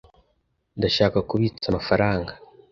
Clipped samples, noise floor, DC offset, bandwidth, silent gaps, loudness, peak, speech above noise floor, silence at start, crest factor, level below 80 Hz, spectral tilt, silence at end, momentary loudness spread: under 0.1%; -70 dBFS; under 0.1%; 7.4 kHz; none; -23 LUFS; -4 dBFS; 48 dB; 0.75 s; 20 dB; -44 dBFS; -6.5 dB/octave; 0.35 s; 10 LU